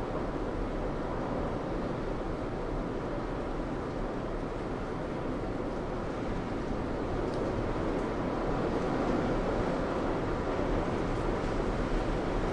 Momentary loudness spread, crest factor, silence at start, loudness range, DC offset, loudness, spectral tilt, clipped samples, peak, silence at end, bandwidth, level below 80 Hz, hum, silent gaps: 5 LU; 14 dB; 0 s; 4 LU; under 0.1%; -33 LUFS; -7.5 dB/octave; under 0.1%; -18 dBFS; 0 s; 10.5 kHz; -40 dBFS; none; none